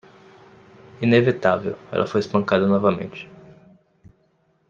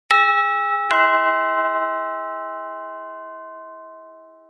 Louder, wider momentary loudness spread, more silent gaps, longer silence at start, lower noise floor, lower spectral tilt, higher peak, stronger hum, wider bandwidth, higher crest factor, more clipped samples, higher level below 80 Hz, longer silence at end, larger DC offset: about the same, -20 LUFS vs -19 LUFS; second, 14 LU vs 21 LU; neither; first, 1 s vs 0.1 s; first, -64 dBFS vs -45 dBFS; first, -7.5 dB/octave vs -0.5 dB/octave; about the same, -2 dBFS vs -2 dBFS; neither; second, 7.4 kHz vs 11.5 kHz; about the same, 20 dB vs 20 dB; neither; first, -62 dBFS vs -82 dBFS; first, 1.45 s vs 0.25 s; neither